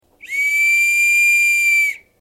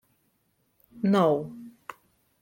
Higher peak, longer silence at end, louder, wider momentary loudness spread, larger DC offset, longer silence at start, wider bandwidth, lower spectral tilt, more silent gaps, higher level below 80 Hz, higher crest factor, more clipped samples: about the same, -8 dBFS vs -10 dBFS; second, 0.25 s vs 0.75 s; first, -13 LUFS vs -25 LUFS; second, 8 LU vs 23 LU; neither; second, 0.25 s vs 0.95 s; about the same, 16 kHz vs 16.5 kHz; second, 4 dB/octave vs -8 dB/octave; neither; first, -64 dBFS vs -70 dBFS; second, 8 dB vs 20 dB; neither